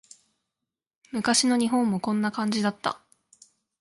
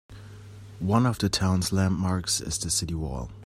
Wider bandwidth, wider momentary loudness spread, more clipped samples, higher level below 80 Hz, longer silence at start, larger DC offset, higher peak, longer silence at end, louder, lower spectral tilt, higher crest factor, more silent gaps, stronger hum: second, 11.5 kHz vs 16 kHz; second, 11 LU vs 22 LU; neither; second, -70 dBFS vs -44 dBFS; first, 1.15 s vs 0.1 s; neither; about the same, -8 dBFS vs -8 dBFS; first, 0.85 s vs 0.05 s; about the same, -25 LUFS vs -26 LUFS; about the same, -3.5 dB/octave vs -4.5 dB/octave; about the same, 20 dB vs 20 dB; neither; neither